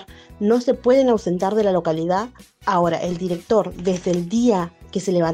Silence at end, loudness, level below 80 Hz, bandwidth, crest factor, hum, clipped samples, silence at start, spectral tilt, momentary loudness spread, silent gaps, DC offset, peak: 0 s; -20 LUFS; -50 dBFS; 13.5 kHz; 14 dB; none; under 0.1%; 0 s; -6.5 dB/octave; 8 LU; none; under 0.1%; -4 dBFS